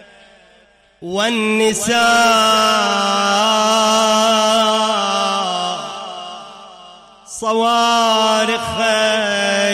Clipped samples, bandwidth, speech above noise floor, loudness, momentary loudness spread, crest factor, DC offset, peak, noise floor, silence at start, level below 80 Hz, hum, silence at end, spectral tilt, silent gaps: under 0.1%; 16 kHz; 37 dB; -14 LUFS; 13 LU; 12 dB; under 0.1%; -4 dBFS; -51 dBFS; 1 s; -54 dBFS; none; 0 s; -2 dB/octave; none